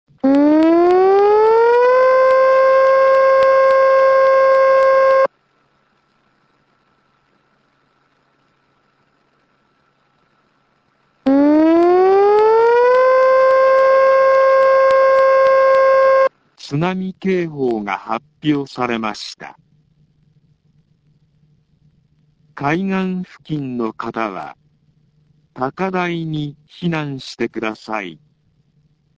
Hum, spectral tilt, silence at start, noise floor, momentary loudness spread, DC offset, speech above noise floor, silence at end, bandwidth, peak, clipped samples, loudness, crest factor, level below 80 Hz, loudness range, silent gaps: none; -7 dB/octave; 0.25 s; -61 dBFS; 13 LU; under 0.1%; 39 dB; 1.05 s; 7.6 kHz; -2 dBFS; under 0.1%; -14 LUFS; 12 dB; -58 dBFS; 14 LU; none